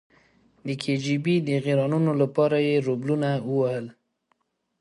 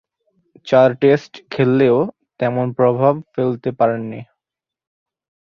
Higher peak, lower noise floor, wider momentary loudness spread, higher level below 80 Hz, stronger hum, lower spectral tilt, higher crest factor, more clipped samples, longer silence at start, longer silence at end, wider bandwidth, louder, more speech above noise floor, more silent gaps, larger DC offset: second, -8 dBFS vs -2 dBFS; second, -72 dBFS vs -86 dBFS; about the same, 10 LU vs 12 LU; second, -70 dBFS vs -60 dBFS; neither; about the same, -7.5 dB/octave vs -8.5 dB/octave; about the same, 16 dB vs 16 dB; neither; about the same, 0.65 s vs 0.65 s; second, 0.9 s vs 1.35 s; first, 11.5 kHz vs 7 kHz; second, -24 LUFS vs -17 LUFS; second, 48 dB vs 70 dB; neither; neither